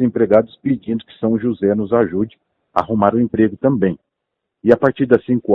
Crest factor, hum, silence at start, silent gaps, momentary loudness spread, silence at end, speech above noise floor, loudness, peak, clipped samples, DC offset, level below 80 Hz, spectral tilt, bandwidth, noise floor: 16 dB; none; 0 s; none; 8 LU; 0 s; 62 dB; -17 LUFS; 0 dBFS; under 0.1%; under 0.1%; -52 dBFS; -10 dB/octave; 5.2 kHz; -78 dBFS